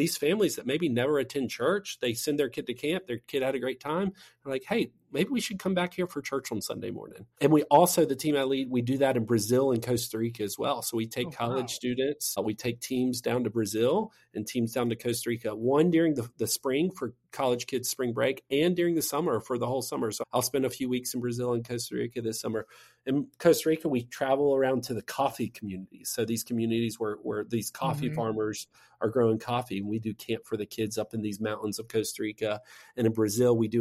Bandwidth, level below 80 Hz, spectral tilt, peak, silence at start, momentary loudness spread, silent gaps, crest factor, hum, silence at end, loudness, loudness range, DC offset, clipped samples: 16 kHz; -66 dBFS; -5 dB/octave; -8 dBFS; 0 s; 9 LU; none; 22 dB; none; 0 s; -29 LUFS; 5 LU; under 0.1%; under 0.1%